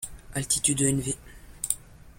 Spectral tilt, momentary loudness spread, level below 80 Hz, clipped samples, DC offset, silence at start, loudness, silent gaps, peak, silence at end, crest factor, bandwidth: -3.5 dB/octave; 13 LU; -48 dBFS; under 0.1%; under 0.1%; 0 s; -27 LUFS; none; -6 dBFS; 0.05 s; 24 dB; 16.5 kHz